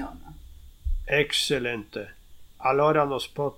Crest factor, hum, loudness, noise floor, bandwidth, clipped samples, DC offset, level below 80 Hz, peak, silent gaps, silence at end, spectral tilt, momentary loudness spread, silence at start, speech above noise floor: 18 dB; none; -25 LUFS; -46 dBFS; 17 kHz; under 0.1%; under 0.1%; -38 dBFS; -8 dBFS; none; 0.05 s; -4 dB/octave; 17 LU; 0 s; 21 dB